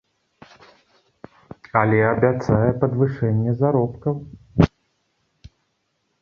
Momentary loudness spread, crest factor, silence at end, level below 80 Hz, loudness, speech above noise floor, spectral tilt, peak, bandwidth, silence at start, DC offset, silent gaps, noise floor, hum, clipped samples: 9 LU; 20 dB; 1.55 s; -42 dBFS; -20 LUFS; 52 dB; -9.5 dB/octave; -2 dBFS; 6.8 kHz; 1.75 s; under 0.1%; none; -71 dBFS; none; under 0.1%